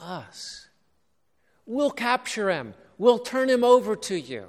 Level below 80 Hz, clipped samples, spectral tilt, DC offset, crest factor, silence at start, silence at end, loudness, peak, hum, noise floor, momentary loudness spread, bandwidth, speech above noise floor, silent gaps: -68 dBFS; under 0.1%; -4 dB/octave; under 0.1%; 20 dB; 0 s; 0 s; -23 LUFS; -6 dBFS; none; -74 dBFS; 19 LU; 14 kHz; 50 dB; none